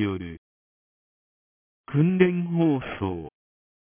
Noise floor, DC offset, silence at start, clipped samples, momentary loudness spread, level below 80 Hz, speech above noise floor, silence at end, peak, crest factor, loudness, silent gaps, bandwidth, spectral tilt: under -90 dBFS; under 0.1%; 0 s; under 0.1%; 17 LU; -52 dBFS; over 67 dB; 0.5 s; -6 dBFS; 22 dB; -24 LUFS; 0.38-1.84 s; 3.6 kHz; -12 dB/octave